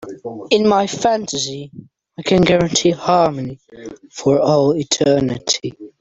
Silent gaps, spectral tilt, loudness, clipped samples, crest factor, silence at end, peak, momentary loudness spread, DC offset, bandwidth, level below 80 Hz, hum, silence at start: none; -4.5 dB/octave; -16 LUFS; under 0.1%; 16 dB; 0.1 s; -2 dBFS; 17 LU; under 0.1%; 8.2 kHz; -48 dBFS; none; 0 s